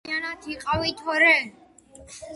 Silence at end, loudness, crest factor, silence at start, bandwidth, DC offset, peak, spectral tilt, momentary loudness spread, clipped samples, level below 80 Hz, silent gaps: 0 s; -22 LUFS; 20 dB; 0.05 s; 11.5 kHz; under 0.1%; -6 dBFS; -3.5 dB/octave; 18 LU; under 0.1%; -52 dBFS; none